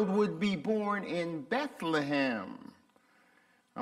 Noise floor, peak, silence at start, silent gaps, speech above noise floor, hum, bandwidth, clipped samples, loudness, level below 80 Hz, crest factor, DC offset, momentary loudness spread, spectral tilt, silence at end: -67 dBFS; -16 dBFS; 0 s; none; 35 dB; none; 12.5 kHz; under 0.1%; -32 LUFS; -72 dBFS; 18 dB; under 0.1%; 12 LU; -6.5 dB/octave; 0 s